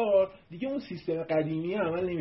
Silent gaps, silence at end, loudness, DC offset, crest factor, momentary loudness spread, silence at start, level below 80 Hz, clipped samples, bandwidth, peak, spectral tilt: none; 0 s; -31 LUFS; under 0.1%; 16 dB; 8 LU; 0 s; -62 dBFS; under 0.1%; 5.8 kHz; -14 dBFS; -11 dB/octave